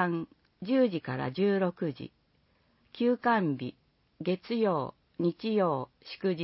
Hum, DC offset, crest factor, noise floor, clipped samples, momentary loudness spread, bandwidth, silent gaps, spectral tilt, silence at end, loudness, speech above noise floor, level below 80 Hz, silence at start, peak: none; under 0.1%; 18 dB; -69 dBFS; under 0.1%; 14 LU; 5.8 kHz; none; -10.5 dB/octave; 0 s; -30 LUFS; 40 dB; -72 dBFS; 0 s; -12 dBFS